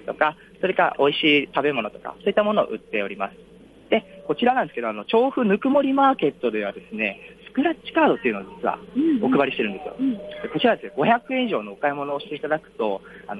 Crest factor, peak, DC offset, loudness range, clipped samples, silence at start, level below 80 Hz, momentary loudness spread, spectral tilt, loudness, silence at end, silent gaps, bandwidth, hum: 18 dB; -6 dBFS; under 0.1%; 3 LU; under 0.1%; 0.05 s; -62 dBFS; 9 LU; -7 dB/octave; -23 LUFS; 0 s; none; 5 kHz; none